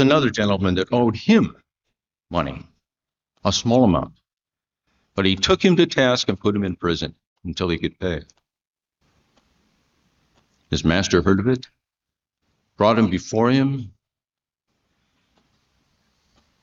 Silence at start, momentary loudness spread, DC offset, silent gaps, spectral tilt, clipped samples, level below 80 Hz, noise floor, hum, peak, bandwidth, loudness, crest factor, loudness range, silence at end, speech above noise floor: 0 s; 13 LU; under 0.1%; 7.27-7.36 s, 8.67-8.74 s; -5.5 dB/octave; under 0.1%; -46 dBFS; under -90 dBFS; none; -2 dBFS; 7.6 kHz; -20 LUFS; 20 dB; 8 LU; 2.75 s; over 71 dB